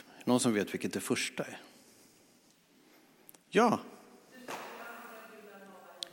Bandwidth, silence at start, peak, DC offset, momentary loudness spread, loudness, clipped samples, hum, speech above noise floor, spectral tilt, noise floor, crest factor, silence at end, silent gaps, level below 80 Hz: 17 kHz; 0.15 s; -12 dBFS; under 0.1%; 24 LU; -33 LUFS; under 0.1%; none; 34 dB; -4 dB/octave; -65 dBFS; 24 dB; 0.05 s; none; -84 dBFS